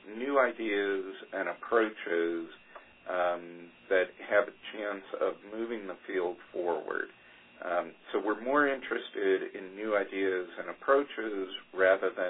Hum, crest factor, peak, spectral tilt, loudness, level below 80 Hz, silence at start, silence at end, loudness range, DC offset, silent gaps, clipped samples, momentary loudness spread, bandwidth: none; 20 dB; -12 dBFS; -7.5 dB/octave; -32 LUFS; -76 dBFS; 0.05 s; 0 s; 5 LU; under 0.1%; none; under 0.1%; 11 LU; 4 kHz